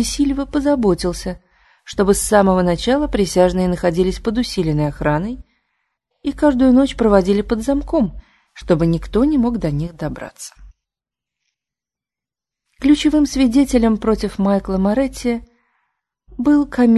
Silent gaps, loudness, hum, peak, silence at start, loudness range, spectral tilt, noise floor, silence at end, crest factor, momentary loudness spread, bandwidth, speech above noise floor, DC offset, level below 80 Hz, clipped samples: none; -17 LUFS; none; 0 dBFS; 0 s; 5 LU; -6 dB/octave; -88 dBFS; 0 s; 18 dB; 13 LU; 12.5 kHz; 72 dB; under 0.1%; -34 dBFS; under 0.1%